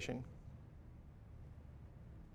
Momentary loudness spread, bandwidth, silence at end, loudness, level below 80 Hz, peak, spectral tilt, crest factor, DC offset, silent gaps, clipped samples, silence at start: 11 LU; 13 kHz; 0 s; -55 LUFS; -60 dBFS; -30 dBFS; -5.5 dB/octave; 22 dB; under 0.1%; none; under 0.1%; 0 s